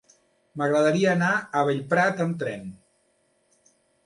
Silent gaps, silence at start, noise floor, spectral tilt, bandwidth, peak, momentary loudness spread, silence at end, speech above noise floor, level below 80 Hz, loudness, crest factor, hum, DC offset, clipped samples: none; 0.55 s; -68 dBFS; -6 dB/octave; 11.5 kHz; -10 dBFS; 15 LU; 1.3 s; 44 dB; -68 dBFS; -23 LUFS; 16 dB; none; under 0.1%; under 0.1%